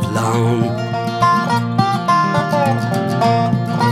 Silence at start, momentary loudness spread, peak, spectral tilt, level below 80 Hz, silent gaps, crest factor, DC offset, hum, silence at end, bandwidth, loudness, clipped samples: 0 s; 4 LU; -2 dBFS; -6.5 dB/octave; -50 dBFS; none; 14 dB; under 0.1%; none; 0 s; 15 kHz; -16 LUFS; under 0.1%